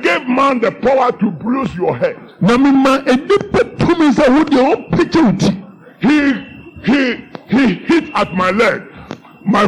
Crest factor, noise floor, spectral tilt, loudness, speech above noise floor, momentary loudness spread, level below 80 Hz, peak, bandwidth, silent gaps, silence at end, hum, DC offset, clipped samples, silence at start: 8 dB; -33 dBFS; -6.5 dB/octave; -14 LUFS; 20 dB; 11 LU; -42 dBFS; -4 dBFS; 11 kHz; none; 0 s; none; under 0.1%; under 0.1%; 0 s